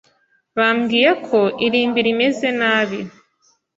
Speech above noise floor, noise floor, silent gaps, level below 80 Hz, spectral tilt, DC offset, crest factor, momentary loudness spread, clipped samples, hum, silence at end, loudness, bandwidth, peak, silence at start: 45 dB; -62 dBFS; none; -64 dBFS; -5 dB/octave; under 0.1%; 18 dB; 9 LU; under 0.1%; none; 0.7 s; -17 LUFS; 7.8 kHz; -2 dBFS; 0.55 s